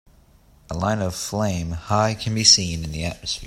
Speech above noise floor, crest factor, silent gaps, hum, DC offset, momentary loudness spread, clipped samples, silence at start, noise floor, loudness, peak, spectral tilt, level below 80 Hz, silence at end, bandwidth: 31 dB; 22 dB; none; none; under 0.1%; 14 LU; under 0.1%; 0.7 s; -53 dBFS; -20 LUFS; 0 dBFS; -3 dB/octave; -44 dBFS; 0 s; 16 kHz